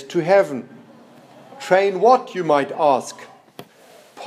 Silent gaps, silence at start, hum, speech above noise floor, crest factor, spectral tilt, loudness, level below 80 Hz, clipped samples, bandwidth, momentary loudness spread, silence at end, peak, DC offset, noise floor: none; 0 s; none; 31 dB; 18 dB; -5 dB/octave; -18 LUFS; -78 dBFS; under 0.1%; 14 kHz; 18 LU; 0 s; -2 dBFS; under 0.1%; -48 dBFS